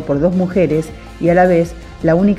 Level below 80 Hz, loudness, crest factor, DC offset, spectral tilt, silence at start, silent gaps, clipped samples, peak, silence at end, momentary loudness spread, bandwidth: -34 dBFS; -15 LUFS; 14 dB; under 0.1%; -8.5 dB/octave; 0 s; none; under 0.1%; 0 dBFS; 0 s; 9 LU; 12.5 kHz